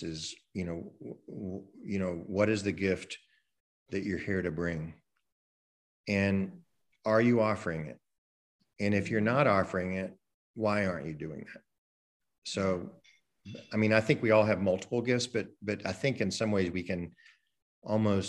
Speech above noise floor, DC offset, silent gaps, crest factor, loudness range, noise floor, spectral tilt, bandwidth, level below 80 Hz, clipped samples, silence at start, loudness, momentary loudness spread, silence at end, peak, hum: over 59 dB; under 0.1%; 3.60-3.86 s, 5.32-6.04 s, 8.18-8.59 s, 10.34-10.54 s, 11.78-12.20 s, 12.38-12.42 s, 17.62-17.82 s; 24 dB; 6 LU; under -90 dBFS; -6 dB/octave; 11.5 kHz; -64 dBFS; under 0.1%; 0 s; -31 LUFS; 19 LU; 0 s; -8 dBFS; none